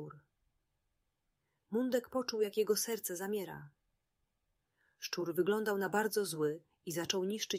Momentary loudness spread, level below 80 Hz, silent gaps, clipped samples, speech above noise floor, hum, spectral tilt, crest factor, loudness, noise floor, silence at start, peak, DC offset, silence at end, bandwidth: 10 LU; -80 dBFS; none; under 0.1%; 48 dB; none; -3.5 dB/octave; 20 dB; -36 LUFS; -84 dBFS; 0 s; -18 dBFS; under 0.1%; 0 s; 16 kHz